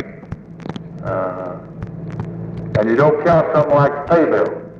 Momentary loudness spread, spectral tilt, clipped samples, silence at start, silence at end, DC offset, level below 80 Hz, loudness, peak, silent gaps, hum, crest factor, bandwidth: 17 LU; -9 dB/octave; under 0.1%; 0 s; 0 s; under 0.1%; -44 dBFS; -16 LUFS; -2 dBFS; none; none; 16 dB; 7.2 kHz